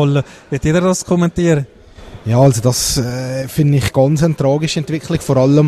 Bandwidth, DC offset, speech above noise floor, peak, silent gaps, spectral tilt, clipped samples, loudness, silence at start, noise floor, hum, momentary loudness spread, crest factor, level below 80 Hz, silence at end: 13.5 kHz; under 0.1%; 22 dB; 0 dBFS; none; -6 dB/octave; under 0.1%; -15 LUFS; 0 s; -36 dBFS; none; 8 LU; 14 dB; -36 dBFS; 0 s